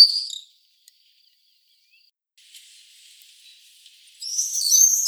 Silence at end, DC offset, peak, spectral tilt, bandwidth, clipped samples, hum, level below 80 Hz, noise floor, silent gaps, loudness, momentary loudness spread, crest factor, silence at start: 0 s; under 0.1%; 0 dBFS; 13.5 dB/octave; over 20 kHz; under 0.1%; none; under -90 dBFS; -62 dBFS; none; -18 LUFS; 21 LU; 24 dB; 0 s